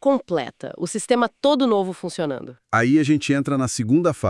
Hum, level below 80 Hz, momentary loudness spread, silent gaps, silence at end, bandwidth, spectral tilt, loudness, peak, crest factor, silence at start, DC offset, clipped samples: none; -62 dBFS; 10 LU; none; 0 s; 12 kHz; -5.5 dB/octave; -21 LUFS; -4 dBFS; 16 dB; 0.05 s; under 0.1%; under 0.1%